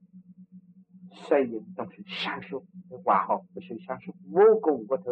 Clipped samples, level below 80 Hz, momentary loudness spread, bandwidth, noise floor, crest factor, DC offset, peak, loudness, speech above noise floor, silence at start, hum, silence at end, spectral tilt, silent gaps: under 0.1%; -78 dBFS; 20 LU; 6 kHz; -53 dBFS; 20 dB; under 0.1%; -8 dBFS; -26 LUFS; 26 dB; 0.15 s; none; 0 s; -7 dB/octave; none